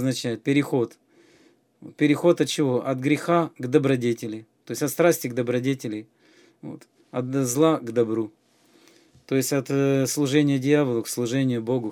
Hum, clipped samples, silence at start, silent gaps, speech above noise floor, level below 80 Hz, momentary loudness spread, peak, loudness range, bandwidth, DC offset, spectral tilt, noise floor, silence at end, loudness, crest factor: none; under 0.1%; 0 s; none; 36 dB; -72 dBFS; 13 LU; -6 dBFS; 4 LU; 19.5 kHz; under 0.1%; -5.5 dB/octave; -59 dBFS; 0 s; -23 LUFS; 18 dB